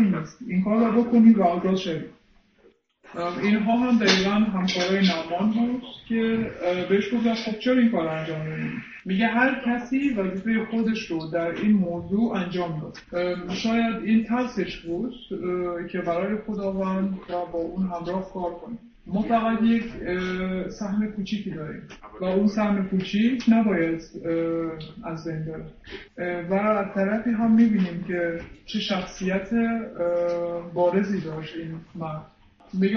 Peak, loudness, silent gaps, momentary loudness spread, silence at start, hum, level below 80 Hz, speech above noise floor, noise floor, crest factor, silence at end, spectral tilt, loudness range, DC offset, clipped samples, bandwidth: -6 dBFS; -25 LUFS; none; 13 LU; 0 s; none; -52 dBFS; 35 dB; -59 dBFS; 18 dB; 0 s; -6.5 dB/octave; 5 LU; under 0.1%; under 0.1%; 6.8 kHz